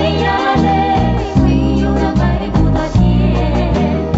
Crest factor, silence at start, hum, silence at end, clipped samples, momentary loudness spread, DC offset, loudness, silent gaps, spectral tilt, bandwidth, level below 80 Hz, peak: 12 dB; 0 s; none; 0 s; under 0.1%; 2 LU; under 0.1%; -14 LUFS; none; -6.5 dB/octave; 8 kHz; -20 dBFS; 0 dBFS